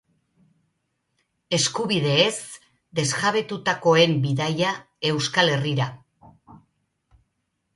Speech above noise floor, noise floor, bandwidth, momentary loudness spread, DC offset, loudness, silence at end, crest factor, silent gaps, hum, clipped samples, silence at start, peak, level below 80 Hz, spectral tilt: 53 dB; -75 dBFS; 11.5 kHz; 9 LU; under 0.1%; -22 LUFS; 1.2 s; 20 dB; none; none; under 0.1%; 1.5 s; -4 dBFS; -64 dBFS; -4 dB/octave